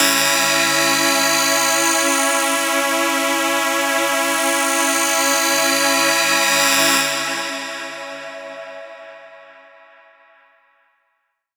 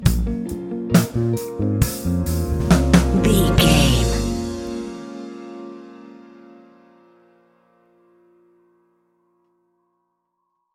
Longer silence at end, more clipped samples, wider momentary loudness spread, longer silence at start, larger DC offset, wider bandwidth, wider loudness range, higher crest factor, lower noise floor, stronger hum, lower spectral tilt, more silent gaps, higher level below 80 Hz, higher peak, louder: second, 2.05 s vs 4.5 s; neither; second, 16 LU vs 20 LU; about the same, 0 s vs 0 s; neither; first, over 20 kHz vs 17 kHz; second, 14 LU vs 19 LU; about the same, 18 dB vs 22 dB; about the same, -70 dBFS vs -73 dBFS; neither; second, 0 dB/octave vs -5.5 dB/octave; neither; second, -70 dBFS vs -28 dBFS; about the same, 0 dBFS vs 0 dBFS; first, -15 LUFS vs -19 LUFS